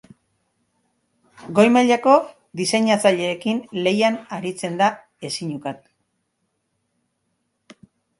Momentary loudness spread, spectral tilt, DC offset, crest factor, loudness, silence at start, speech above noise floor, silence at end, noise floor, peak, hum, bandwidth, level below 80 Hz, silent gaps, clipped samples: 15 LU; -4.5 dB/octave; under 0.1%; 22 dB; -19 LUFS; 1.4 s; 54 dB; 2.45 s; -73 dBFS; 0 dBFS; none; 11.5 kHz; -68 dBFS; none; under 0.1%